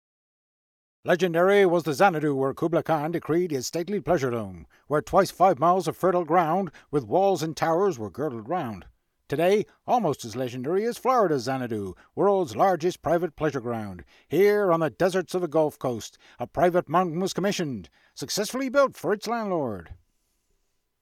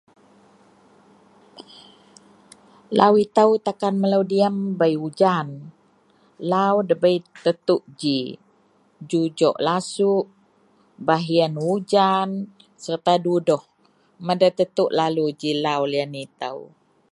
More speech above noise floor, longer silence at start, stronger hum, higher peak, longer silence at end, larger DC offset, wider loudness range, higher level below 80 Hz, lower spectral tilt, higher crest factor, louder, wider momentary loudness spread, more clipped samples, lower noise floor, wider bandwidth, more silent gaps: first, 47 dB vs 40 dB; second, 1.05 s vs 1.55 s; neither; second, -6 dBFS vs 0 dBFS; first, 1.05 s vs 0.45 s; neither; about the same, 3 LU vs 3 LU; first, -58 dBFS vs -72 dBFS; about the same, -5.5 dB/octave vs -6 dB/octave; about the same, 18 dB vs 22 dB; second, -25 LUFS vs -21 LUFS; about the same, 12 LU vs 13 LU; neither; first, -72 dBFS vs -60 dBFS; first, 16 kHz vs 11.5 kHz; neither